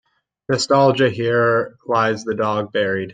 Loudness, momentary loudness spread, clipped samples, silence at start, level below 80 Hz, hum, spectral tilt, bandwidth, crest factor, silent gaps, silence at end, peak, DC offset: -18 LUFS; 7 LU; under 0.1%; 0.5 s; -60 dBFS; none; -5 dB/octave; 9.4 kHz; 16 dB; none; 0 s; -2 dBFS; under 0.1%